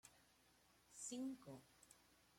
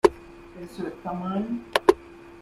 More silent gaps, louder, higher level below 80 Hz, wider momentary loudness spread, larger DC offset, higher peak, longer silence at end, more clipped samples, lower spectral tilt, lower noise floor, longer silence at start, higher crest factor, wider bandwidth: neither; second, -53 LUFS vs -26 LUFS; second, -86 dBFS vs -52 dBFS; second, 19 LU vs 24 LU; neither; second, -40 dBFS vs -2 dBFS; about the same, 0 s vs 0 s; neither; second, -3.5 dB/octave vs -5.5 dB/octave; first, -75 dBFS vs -44 dBFS; about the same, 0.05 s vs 0.05 s; second, 16 dB vs 24 dB; about the same, 16 kHz vs 15 kHz